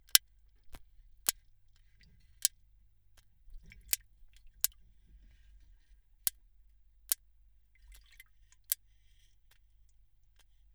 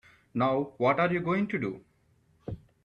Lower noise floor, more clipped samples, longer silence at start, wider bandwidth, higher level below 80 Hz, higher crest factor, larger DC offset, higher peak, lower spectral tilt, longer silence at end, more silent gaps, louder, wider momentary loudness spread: about the same, -66 dBFS vs -67 dBFS; neither; second, 0.15 s vs 0.35 s; first, over 20 kHz vs 6.8 kHz; about the same, -62 dBFS vs -60 dBFS; first, 42 dB vs 18 dB; neither; first, 0 dBFS vs -12 dBFS; second, 2.5 dB/octave vs -8.5 dB/octave; first, 2 s vs 0.3 s; neither; second, -34 LUFS vs -29 LUFS; first, 20 LU vs 17 LU